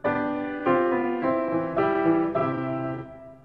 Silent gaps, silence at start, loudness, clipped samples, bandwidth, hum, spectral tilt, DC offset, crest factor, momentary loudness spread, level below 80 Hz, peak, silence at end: none; 0.05 s; -25 LUFS; under 0.1%; 5 kHz; none; -9.5 dB/octave; under 0.1%; 14 dB; 8 LU; -58 dBFS; -10 dBFS; 0.05 s